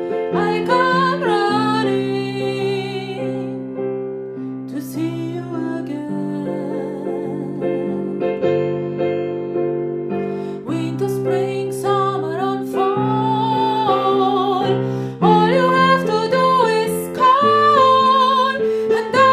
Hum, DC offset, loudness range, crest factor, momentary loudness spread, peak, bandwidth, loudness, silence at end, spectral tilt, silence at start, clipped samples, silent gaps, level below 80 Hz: none; under 0.1%; 10 LU; 16 dB; 11 LU; -2 dBFS; 15.5 kHz; -18 LUFS; 0 s; -6 dB/octave; 0 s; under 0.1%; none; -62 dBFS